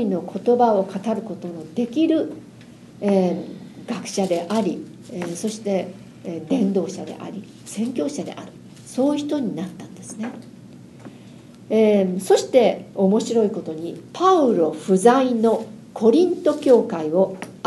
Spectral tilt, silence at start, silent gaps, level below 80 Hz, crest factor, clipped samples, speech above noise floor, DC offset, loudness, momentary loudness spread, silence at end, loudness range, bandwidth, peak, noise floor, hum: -6 dB/octave; 0 s; none; -66 dBFS; 20 dB; under 0.1%; 23 dB; under 0.1%; -21 LUFS; 18 LU; 0.05 s; 8 LU; 12.5 kHz; -2 dBFS; -43 dBFS; none